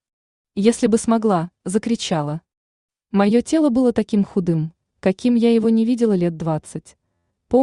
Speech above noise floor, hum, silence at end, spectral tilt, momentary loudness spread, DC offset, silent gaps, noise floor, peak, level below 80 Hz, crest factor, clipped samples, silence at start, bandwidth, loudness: 54 dB; none; 0 s; -6.5 dB/octave; 10 LU; under 0.1%; 2.57-2.89 s; -72 dBFS; -4 dBFS; -54 dBFS; 16 dB; under 0.1%; 0.55 s; 11 kHz; -19 LUFS